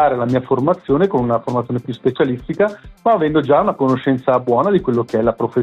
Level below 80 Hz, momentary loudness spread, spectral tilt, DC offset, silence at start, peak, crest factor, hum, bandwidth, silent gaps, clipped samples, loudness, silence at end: -46 dBFS; 5 LU; -8.5 dB/octave; under 0.1%; 0 s; -4 dBFS; 12 dB; none; 8.4 kHz; none; under 0.1%; -17 LUFS; 0 s